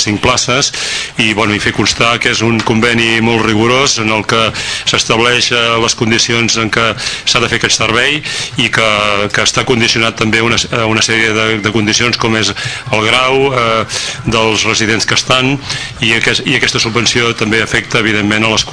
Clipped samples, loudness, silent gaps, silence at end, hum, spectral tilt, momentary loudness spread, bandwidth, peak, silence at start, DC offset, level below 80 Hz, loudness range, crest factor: 0.6%; -10 LUFS; none; 0 s; none; -3 dB/octave; 4 LU; 11 kHz; 0 dBFS; 0 s; under 0.1%; -36 dBFS; 1 LU; 12 dB